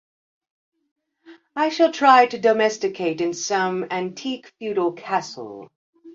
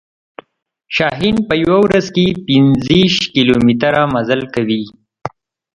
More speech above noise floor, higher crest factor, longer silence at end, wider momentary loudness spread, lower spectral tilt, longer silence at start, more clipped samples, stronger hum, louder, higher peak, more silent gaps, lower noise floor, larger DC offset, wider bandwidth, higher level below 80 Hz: second, 29 dB vs 48 dB; first, 20 dB vs 14 dB; second, 0.05 s vs 0.45 s; first, 19 LU vs 13 LU; second, -3.5 dB/octave vs -6 dB/octave; first, 1.3 s vs 0.9 s; neither; neither; second, -21 LUFS vs -13 LUFS; about the same, -2 dBFS vs 0 dBFS; first, 5.76-5.93 s vs none; second, -50 dBFS vs -61 dBFS; neither; second, 7.6 kHz vs 10.5 kHz; second, -72 dBFS vs -42 dBFS